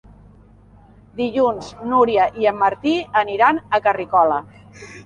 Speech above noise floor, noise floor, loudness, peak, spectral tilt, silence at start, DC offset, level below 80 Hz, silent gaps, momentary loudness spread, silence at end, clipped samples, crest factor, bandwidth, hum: 29 dB; -48 dBFS; -18 LUFS; -2 dBFS; -5.5 dB/octave; 1.15 s; under 0.1%; -52 dBFS; none; 10 LU; 0.05 s; under 0.1%; 18 dB; 10 kHz; none